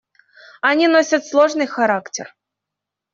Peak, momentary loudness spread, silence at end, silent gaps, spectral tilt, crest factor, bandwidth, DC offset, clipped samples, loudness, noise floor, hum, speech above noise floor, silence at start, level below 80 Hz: -2 dBFS; 15 LU; 0.85 s; none; -3 dB/octave; 16 dB; 7.6 kHz; under 0.1%; under 0.1%; -16 LUFS; -83 dBFS; none; 67 dB; 0.65 s; -70 dBFS